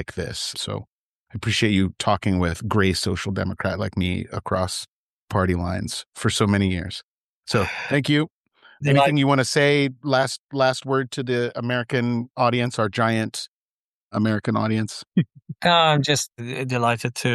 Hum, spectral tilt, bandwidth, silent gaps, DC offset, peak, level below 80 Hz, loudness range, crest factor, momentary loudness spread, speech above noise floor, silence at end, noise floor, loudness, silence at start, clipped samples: none; -5 dB/octave; 12.5 kHz; 0.87-1.26 s, 4.88-5.28 s, 6.06-6.12 s, 7.03-7.43 s, 8.30-8.44 s, 10.39-10.47 s, 13.48-14.09 s, 15.07-15.11 s; under 0.1%; -6 dBFS; -48 dBFS; 4 LU; 18 dB; 11 LU; over 68 dB; 0 s; under -90 dBFS; -22 LUFS; 0 s; under 0.1%